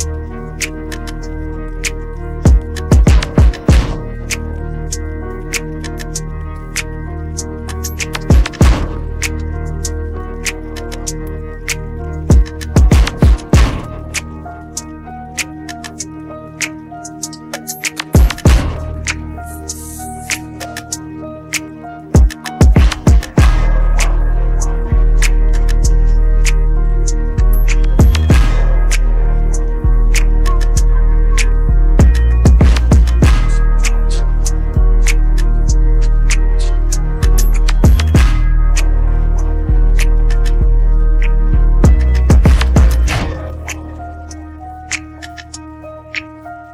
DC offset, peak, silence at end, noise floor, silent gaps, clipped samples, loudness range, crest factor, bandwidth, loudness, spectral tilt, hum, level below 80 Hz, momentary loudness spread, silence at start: under 0.1%; 0 dBFS; 0 s; -31 dBFS; none; under 0.1%; 9 LU; 10 dB; 13.5 kHz; -15 LUFS; -5.5 dB/octave; none; -12 dBFS; 15 LU; 0 s